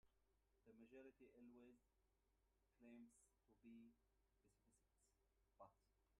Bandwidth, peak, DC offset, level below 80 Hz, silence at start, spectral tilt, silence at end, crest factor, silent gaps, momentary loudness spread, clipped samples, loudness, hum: 10 kHz; -54 dBFS; under 0.1%; -88 dBFS; 0.05 s; -5.5 dB/octave; 0 s; 18 dB; none; 2 LU; under 0.1%; -68 LUFS; none